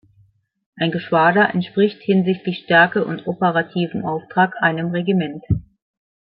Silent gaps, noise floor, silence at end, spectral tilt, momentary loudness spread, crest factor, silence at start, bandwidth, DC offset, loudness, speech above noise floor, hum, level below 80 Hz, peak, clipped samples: none; -57 dBFS; 0.6 s; -11 dB/octave; 10 LU; 18 dB; 0.75 s; 5 kHz; under 0.1%; -19 LUFS; 39 dB; none; -48 dBFS; -2 dBFS; under 0.1%